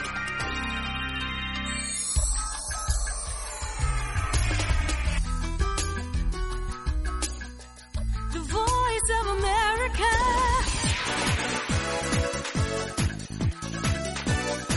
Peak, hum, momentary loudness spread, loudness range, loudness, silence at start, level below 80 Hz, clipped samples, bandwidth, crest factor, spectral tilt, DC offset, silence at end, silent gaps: -12 dBFS; none; 8 LU; 5 LU; -27 LUFS; 0 s; -32 dBFS; under 0.1%; 11.5 kHz; 16 dB; -3.5 dB/octave; under 0.1%; 0 s; none